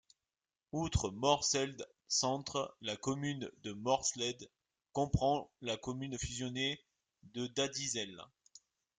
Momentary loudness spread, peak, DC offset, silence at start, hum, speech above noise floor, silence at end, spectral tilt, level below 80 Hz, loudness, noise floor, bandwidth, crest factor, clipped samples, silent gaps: 12 LU; -16 dBFS; under 0.1%; 0.75 s; none; over 53 dB; 0.75 s; -3.5 dB/octave; -56 dBFS; -37 LUFS; under -90 dBFS; 10.5 kHz; 24 dB; under 0.1%; none